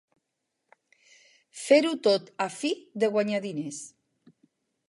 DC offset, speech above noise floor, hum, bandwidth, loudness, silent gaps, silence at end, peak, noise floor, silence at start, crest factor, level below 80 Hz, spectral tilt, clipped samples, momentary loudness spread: under 0.1%; 56 dB; none; 11.5 kHz; -26 LUFS; none; 1 s; -8 dBFS; -82 dBFS; 1.55 s; 22 dB; -84 dBFS; -4 dB/octave; under 0.1%; 18 LU